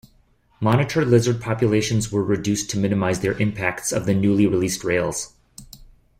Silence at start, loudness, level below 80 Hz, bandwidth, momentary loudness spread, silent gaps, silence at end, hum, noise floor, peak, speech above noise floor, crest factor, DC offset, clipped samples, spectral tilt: 0.6 s; -21 LUFS; -48 dBFS; 16 kHz; 6 LU; none; 0.35 s; none; -58 dBFS; -4 dBFS; 38 dB; 18 dB; under 0.1%; under 0.1%; -5.5 dB/octave